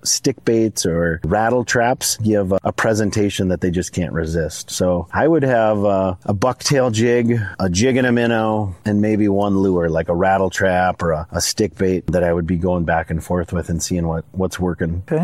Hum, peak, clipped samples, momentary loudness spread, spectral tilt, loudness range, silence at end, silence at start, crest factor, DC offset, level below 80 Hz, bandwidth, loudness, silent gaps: none; -2 dBFS; under 0.1%; 6 LU; -5 dB/octave; 3 LU; 0 s; 0.05 s; 14 dB; 0.1%; -38 dBFS; 16 kHz; -18 LUFS; none